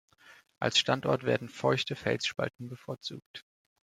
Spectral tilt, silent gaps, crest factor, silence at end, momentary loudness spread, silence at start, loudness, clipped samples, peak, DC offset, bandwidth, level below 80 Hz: -4 dB/octave; 3.26-3.34 s; 22 dB; 0.55 s; 17 LU; 0.25 s; -31 LUFS; under 0.1%; -10 dBFS; under 0.1%; 14 kHz; -70 dBFS